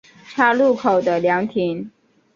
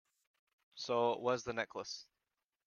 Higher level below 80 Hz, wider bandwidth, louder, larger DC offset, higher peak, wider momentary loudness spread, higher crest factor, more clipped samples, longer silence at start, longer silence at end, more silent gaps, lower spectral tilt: first, -64 dBFS vs -76 dBFS; about the same, 7.4 kHz vs 7.2 kHz; first, -18 LUFS vs -38 LUFS; neither; first, -2 dBFS vs -20 dBFS; about the same, 15 LU vs 14 LU; about the same, 16 dB vs 20 dB; neither; second, 0.3 s vs 0.75 s; second, 0.45 s vs 0.65 s; neither; first, -6.5 dB/octave vs -4 dB/octave